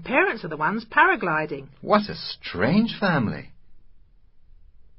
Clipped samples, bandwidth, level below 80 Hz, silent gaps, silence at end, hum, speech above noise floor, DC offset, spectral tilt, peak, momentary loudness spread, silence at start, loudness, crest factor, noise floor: under 0.1%; 5.8 kHz; -54 dBFS; none; 0.6 s; none; 28 dB; under 0.1%; -10 dB/octave; -4 dBFS; 13 LU; 0 s; -23 LUFS; 20 dB; -51 dBFS